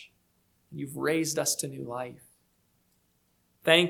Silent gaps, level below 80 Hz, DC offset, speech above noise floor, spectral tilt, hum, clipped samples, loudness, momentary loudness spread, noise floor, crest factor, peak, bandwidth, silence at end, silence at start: none; -74 dBFS; under 0.1%; 39 dB; -3 dB/octave; 60 Hz at -65 dBFS; under 0.1%; -30 LUFS; 14 LU; -71 dBFS; 26 dB; -6 dBFS; 19 kHz; 0 s; 0 s